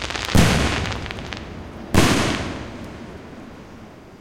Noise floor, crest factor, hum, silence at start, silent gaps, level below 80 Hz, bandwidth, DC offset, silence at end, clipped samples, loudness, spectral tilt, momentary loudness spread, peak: -41 dBFS; 18 dB; none; 0 s; none; -32 dBFS; 17 kHz; under 0.1%; 0.05 s; under 0.1%; -21 LUFS; -4.5 dB/octave; 23 LU; -4 dBFS